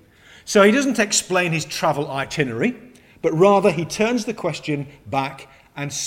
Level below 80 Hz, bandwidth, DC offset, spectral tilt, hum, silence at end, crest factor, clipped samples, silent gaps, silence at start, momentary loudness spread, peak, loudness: -56 dBFS; 16.5 kHz; under 0.1%; -4 dB/octave; none; 0 s; 18 dB; under 0.1%; none; 0.45 s; 13 LU; -2 dBFS; -20 LUFS